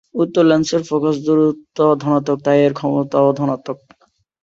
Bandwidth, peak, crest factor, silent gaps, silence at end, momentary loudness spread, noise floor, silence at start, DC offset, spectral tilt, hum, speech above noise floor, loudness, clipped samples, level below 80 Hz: 7.8 kHz; -2 dBFS; 16 dB; none; 0.65 s; 7 LU; -59 dBFS; 0.15 s; under 0.1%; -6.5 dB/octave; none; 44 dB; -16 LUFS; under 0.1%; -60 dBFS